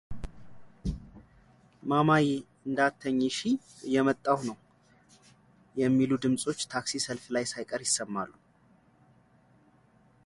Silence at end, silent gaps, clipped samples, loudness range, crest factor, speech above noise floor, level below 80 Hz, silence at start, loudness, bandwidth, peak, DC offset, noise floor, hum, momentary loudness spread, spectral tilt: 1.95 s; none; under 0.1%; 5 LU; 22 dB; 35 dB; -52 dBFS; 0.1 s; -29 LUFS; 11.5 kHz; -10 dBFS; under 0.1%; -63 dBFS; none; 15 LU; -4.5 dB/octave